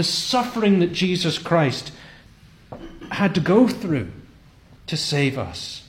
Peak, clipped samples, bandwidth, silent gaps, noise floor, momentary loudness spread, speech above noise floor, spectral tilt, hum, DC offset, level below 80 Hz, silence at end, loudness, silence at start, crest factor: -4 dBFS; under 0.1%; 16.5 kHz; none; -49 dBFS; 20 LU; 28 dB; -5 dB/octave; none; under 0.1%; -50 dBFS; 0.05 s; -21 LUFS; 0 s; 18 dB